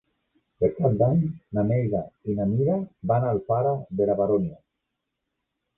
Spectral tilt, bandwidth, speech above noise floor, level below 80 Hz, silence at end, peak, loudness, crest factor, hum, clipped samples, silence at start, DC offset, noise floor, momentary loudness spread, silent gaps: -13.5 dB/octave; 2.7 kHz; 58 dB; -52 dBFS; 1.25 s; -8 dBFS; -25 LUFS; 16 dB; none; under 0.1%; 0.6 s; under 0.1%; -81 dBFS; 6 LU; none